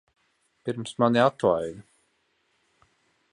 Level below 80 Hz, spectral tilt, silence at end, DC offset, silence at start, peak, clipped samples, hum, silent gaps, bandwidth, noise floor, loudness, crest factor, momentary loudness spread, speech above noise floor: -64 dBFS; -6 dB/octave; 1.5 s; under 0.1%; 0.65 s; -6 dBFS; under 0.1%; none; none; 11 kHz; -71 dBFS; -25 LUFS; 22 dB; 16 LU; 47 dB